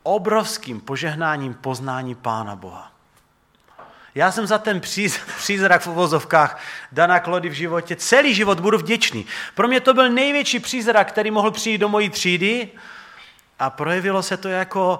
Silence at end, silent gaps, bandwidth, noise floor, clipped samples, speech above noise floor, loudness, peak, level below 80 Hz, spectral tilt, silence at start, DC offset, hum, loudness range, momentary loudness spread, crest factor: 0 s; none; 16.5 kHz; -59 dBFS; under 0.1%; 40 dB; -19 LUFS; 0 dBFS; -64 dBFS; -3.5 dB/octave; 0.05 s; under 0.1%; none; 8 LU; 12 LU; 20 dB